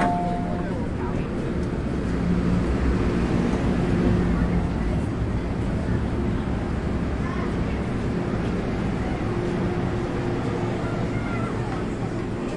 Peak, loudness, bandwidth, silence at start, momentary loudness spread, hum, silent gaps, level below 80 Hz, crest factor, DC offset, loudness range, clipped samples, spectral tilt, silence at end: -8 dBFS; -25 LUFS; 11 kHz; 0 s; 4 LU; none; none; -32 dBFS; 16 dB; under 0.1%; 3 LU; under 0.1%; -8 dB/octave; 0 s